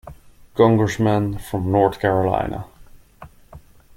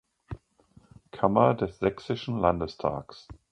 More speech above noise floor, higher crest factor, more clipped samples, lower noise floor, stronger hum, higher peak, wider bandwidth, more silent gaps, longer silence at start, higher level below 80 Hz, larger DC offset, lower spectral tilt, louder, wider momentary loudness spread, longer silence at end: second, 27 dB vs 33 dB; about the same, 20 dB vs 24 dB; neither; second, -45 dBFS vs -60 dBFS; neither; first, -2 dBFS vs -6 dBFS; first, 16 kHz vs 9.6 kHz; neither; second, 0.05 s vs 0.3 s; first, -44 dBFS vs -50 dBFS; neither; about the same, -7.5 dB/octave vs -8 dB/octave; first, -19 LUFS vs -27 LUFS; second, 14 LU vs 22 LU; first, 0.4 s vs 0.2 s